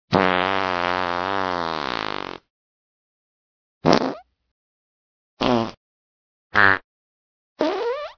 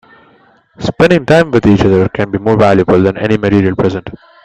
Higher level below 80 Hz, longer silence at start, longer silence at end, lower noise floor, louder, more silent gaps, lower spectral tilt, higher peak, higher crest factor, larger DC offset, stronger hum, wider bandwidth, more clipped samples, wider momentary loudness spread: second, -54 dBFS vs -38 dBFS; second, 0.1 s vs 0.8 s; second, 0.05 s vs 0.3 s; first, under -90 dBFS vs -48 dBFS; second, -22 LUFS vs -11 LUFS; first, 2.50-3.81 s, 4.51-5.37 s, 5.77-6.50 s, 6.84-7.56 s vs none; second, -5 dB/octave vs -7.5 dB/octave; about the same, 0 dBFS vs 0 dBFS; first, 24 dB vs 12 dB; neither; neither; second, 5.4 kHz vs 9.2 kHz; neither; about the same, 12 LU vs 10 LU